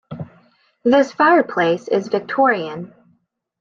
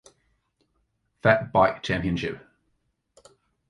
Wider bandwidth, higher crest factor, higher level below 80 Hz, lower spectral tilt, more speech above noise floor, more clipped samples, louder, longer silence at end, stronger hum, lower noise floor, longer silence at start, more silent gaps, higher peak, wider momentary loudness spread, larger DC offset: second, 7.4 kHz vs 11 kHz; second, 16 dB vs 22 dB; second, -64 dBFS vs -50 dBFS; about the same, -6 dB/octave vs -6.5 dB/octave; about the same, 47 dB vs 50 dB; neither; first, -17 LUFS vs -24 LUFS; second, 0.75 s vs 1.3 s; neither; second, -63 dBFS vs -73 dBFS; second, 0.1 s vs 1.25 s; neither; about the same, -2 dBFS vs -4 dBFS; first, 20 LU vs 12 LU; neither